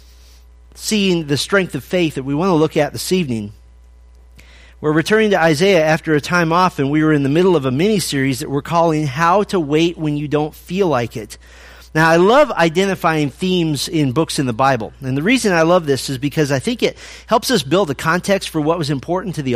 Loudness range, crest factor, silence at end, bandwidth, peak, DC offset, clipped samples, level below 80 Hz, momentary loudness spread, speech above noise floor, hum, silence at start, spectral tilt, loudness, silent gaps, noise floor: 4 LU; 16 dB; 0 s; 15.5 kHz; 0 dBFS; under 0.1%; under 0.1%; -44 dBFS; 8 LU; 28 dB; none; 0.75 s; -5 dB/octave; -16 LUFS; none; -43 dBFS